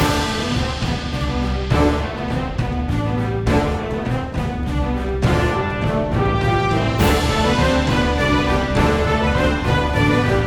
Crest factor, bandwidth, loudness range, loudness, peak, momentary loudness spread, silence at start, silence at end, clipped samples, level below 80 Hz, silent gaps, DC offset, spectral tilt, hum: 14 dB; 16 kHz; 4 LU; -19 LUFS; -4 dBFS; 6 LU; 0 s; 0 s; under 0.1%; -26 dBFS; none; under 0.1%; -6 dB/octave; none